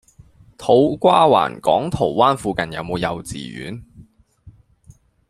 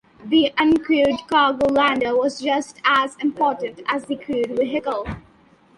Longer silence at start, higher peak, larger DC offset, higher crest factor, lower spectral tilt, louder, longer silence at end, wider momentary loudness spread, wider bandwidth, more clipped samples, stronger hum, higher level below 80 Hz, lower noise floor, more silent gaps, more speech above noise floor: first, 0.6 s vs 0.2 s; first, 0 dBFS vs -4 dBFS; neither; about the same, 18 dB vs 16 dB; first, -6 dB/octave vs -4.5 dB/octave; first, -17 LUFS vs -20 LUFS; first, 0.8 s vs 0.6 s; first, 17 LU vs 9 LU; first, 13.5 kHz vs 11.5 kHz; neither; neither; about the same, -48 dBFS vs -50 dBFS; about the same, -50 dBFS vs -53 dBFS; neither; about the same, 32 dB vs 34 dB